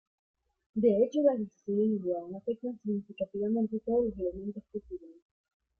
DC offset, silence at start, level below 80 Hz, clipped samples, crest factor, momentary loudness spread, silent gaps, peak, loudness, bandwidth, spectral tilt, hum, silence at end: under 0.1%; 0.75 s; -62 dBFS; under 0.1%; 18 dB; 15 LU; none; -14 dBFS; -31 LUFS; 6.6 kHz; -9 dB/octave; none; 0.7 s